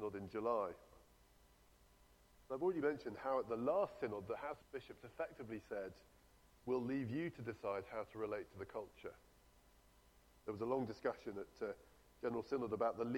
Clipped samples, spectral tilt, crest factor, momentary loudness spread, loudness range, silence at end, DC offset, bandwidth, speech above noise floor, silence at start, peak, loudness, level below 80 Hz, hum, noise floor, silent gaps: under 0.1%; -7.5 dB/octave; 18 dB; 13 LU; 5 LU; 0 s; under 0.1%; 18 kHz; 26 dB; 0 s; -26 dBFS; -44 LUFS; -72 dBFS; none; -69 dBFS; none